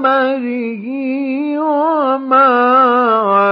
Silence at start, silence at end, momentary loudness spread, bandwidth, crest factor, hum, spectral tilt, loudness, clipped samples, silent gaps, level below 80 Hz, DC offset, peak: 0 s; 0 s; 10 LU; 5.6 kHz; 12 dB; none; -8 dB/octave; -13 LUFS; under 0.1%; none; -80 dBFS; under 0.1%; 0 dBFS